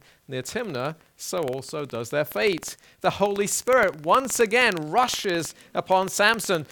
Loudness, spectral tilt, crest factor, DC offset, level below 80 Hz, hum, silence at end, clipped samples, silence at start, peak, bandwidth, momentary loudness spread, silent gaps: -24 LUFS; -3 dB/octave; 20 dB; under 0.1%; -60 dBFS; none; 0.05 s; under 0.1%; 0.3 s; -4 dBFS; 19 kHz; 12 LU; none